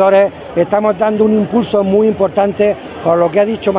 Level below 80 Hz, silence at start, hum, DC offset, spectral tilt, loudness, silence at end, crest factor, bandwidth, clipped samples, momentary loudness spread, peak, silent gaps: -46 dBFS; 0 s; none; under 0.1%; -11 dB/octave; -13 LUFS; 0 s; 12 dB; 4 kHz; under 0.1%; 4 LU; 0 dBFS; none